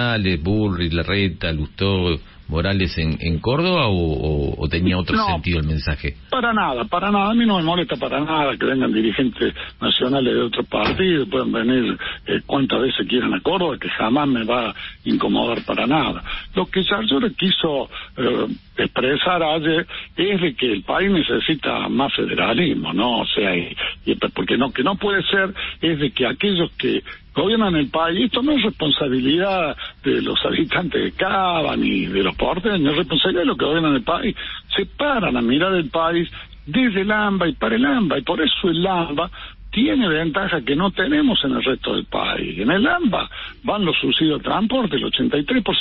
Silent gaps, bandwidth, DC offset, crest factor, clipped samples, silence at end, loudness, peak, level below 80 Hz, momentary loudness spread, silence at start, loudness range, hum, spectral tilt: none; 5.8 kHz; under 0.1%; 14 dB; under 0.1%; 0 s; -19 LUFS; -6 dBFS; -38 dBFS; 6 LU; 0 s; 1 LU; none; -10.5 dB/octave